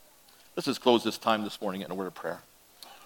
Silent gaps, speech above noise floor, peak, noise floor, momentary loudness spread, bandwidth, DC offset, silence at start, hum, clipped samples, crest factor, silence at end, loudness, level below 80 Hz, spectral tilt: none; 28 dB; -8 dBFS; -58 dBFS; 18 LU; 17.5 kHz; under 0.1%; 0.55 s; none; under 0.1%; 24 dB; 0 s; -30 LUFS; -76 dBFS; -4.5 dB/octave